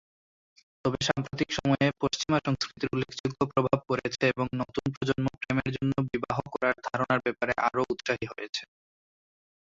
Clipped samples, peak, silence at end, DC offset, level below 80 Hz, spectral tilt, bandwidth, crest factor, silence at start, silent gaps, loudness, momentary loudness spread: under 0.1%; -8 dBFS; 1.1 s; under 0.1%; -56 dBFS; -5.5 dB/octave; 7.8 kHz; 20 dB; 0.85 s; 3.20-3.24 s, 4.97-5.01 s, 8.49-8.53 s; -29 LUFS; 6 LU